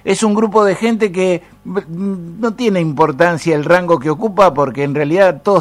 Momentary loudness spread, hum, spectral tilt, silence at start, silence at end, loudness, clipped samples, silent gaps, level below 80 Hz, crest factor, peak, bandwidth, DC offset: 10 LU; none; -6 dB/octave; 0.05 s; 0 s; -14 LUFS; under 0.1%; none; -50 dBFS; 14 dB; 0 dBFS; 14.5 kHz; under 0.1%